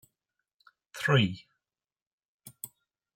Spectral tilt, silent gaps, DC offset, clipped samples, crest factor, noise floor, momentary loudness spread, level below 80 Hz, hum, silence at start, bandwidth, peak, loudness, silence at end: -5.5 dB/octave; 2.02-2.18 s, 2.25-2.39 s; under 0.1%; under 0.1%; 24 dB; under -90 dBFS; 21 LU; -72 dBFS; none; 0.95 s; 16.5 kHz; -12 dBFS; -27 LUFS; 0.5 s